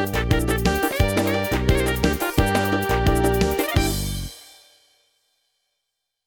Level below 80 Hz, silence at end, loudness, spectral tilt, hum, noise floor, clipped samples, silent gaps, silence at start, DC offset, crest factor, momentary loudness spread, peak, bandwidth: -30 dBFS; 1.85 s; -21 LUFS; -5 dB/octave; none; -79 dBFS; under 0.1%; none; 0 s; under 0.1%; 18 dB; 6 LU; -4 dBFS; over 20 kHz